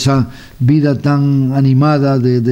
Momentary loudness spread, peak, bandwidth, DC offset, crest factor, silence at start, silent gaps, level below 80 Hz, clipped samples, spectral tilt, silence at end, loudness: 5 LU; -2 dBFS; 9.2 kHz; under 0.1%; 10 dB; 0 s; none; -42 dBFS; under 0.1%; -8 dB/octave; 0 s; -13 LUFS